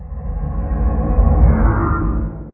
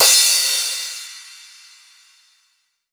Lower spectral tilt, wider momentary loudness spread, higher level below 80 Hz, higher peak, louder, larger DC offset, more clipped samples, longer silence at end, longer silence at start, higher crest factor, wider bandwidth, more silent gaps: first, -14.5 dB/octave vs 4.5 dB/octave; second, 11 LU vs 25 LU; first, -16 dBFS vs -72 dBFS; about the same, 0 dBFS vs -2 dBFS; second, -18 LUFS vs -15 LUFS; neither; neither; second, 0.05 s vs 1.55 s; about the same, 0 s vs 0 s; about the same, 16 dB vs 20 dB; second, 2.6 kHz vs over 20 kHz; neither